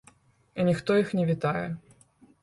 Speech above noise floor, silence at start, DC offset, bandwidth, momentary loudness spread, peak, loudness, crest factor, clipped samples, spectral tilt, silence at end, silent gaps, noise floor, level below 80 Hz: 34 dB; 0.55 s; under 0.1%; 11.5 kHz; 15 LU; -12 dBFS; -27 LUFS; 16 dB; under 0.1%; -7.5 dB/octave; 0.65 s; none; -60 dBFS; -62 dBFS